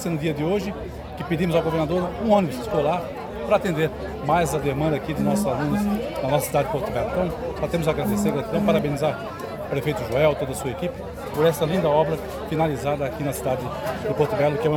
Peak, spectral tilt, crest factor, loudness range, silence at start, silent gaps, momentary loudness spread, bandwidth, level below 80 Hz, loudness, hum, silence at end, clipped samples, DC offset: -6 dBFS; -6 dB/octave; 18 dB; 1 LU; 0 s; none; 8 LU; 19.5 kHz; -42 dBFS; -24 LUFS; none; 0 s; under 0.1%; under 0.1%